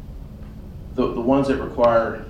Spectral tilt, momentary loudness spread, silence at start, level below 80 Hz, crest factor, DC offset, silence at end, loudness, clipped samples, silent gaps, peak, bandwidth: -7.5 dB/octave; 21 LU; 0 s; -38 dBFS; 16 dB; under 0.1%; 0 s; -20 LUFS; under 0.1%; none; -6 dBFS; 9.8 kHz